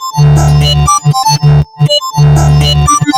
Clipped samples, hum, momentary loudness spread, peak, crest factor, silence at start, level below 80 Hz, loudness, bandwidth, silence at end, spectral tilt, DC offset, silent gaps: under 0.1%; none; 3 LU; 0 dBFS; 6 dB; 0 s; -18 dBFS; -8 LUFS; 15.5 kHz; 0 s; -5 dB/octave; under 0.1%; none